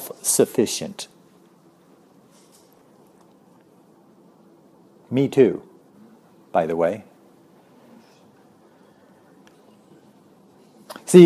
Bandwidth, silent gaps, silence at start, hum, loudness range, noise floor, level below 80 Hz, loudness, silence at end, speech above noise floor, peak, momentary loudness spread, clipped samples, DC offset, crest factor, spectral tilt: 14 kHz; none; 0 s; none; 11 LU; -54 dBFS; -70 dBFS; -21 LUFS; 0 s; 34 dB; 0 dBFS; 19 LU; under 0.1%; under 0.1%; 24 dB; -5.5 dB/octave